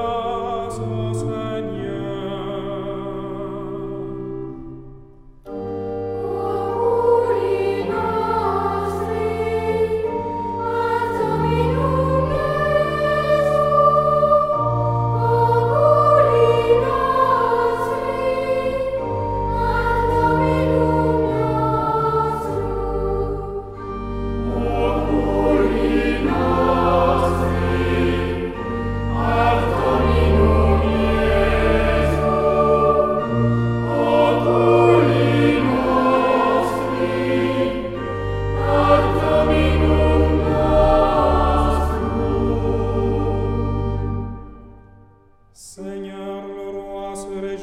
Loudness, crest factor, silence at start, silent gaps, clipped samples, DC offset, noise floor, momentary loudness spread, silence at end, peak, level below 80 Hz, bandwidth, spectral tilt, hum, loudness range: -19 LUFS; 16 dB; 0 s; none; under 0.1%; under 0.1%; -51 dBFS; 13 LU; 0 s; -2 dBFS; -28 dBFS; 13.5 kHz; -7.5 dB/octave; none; 10 LU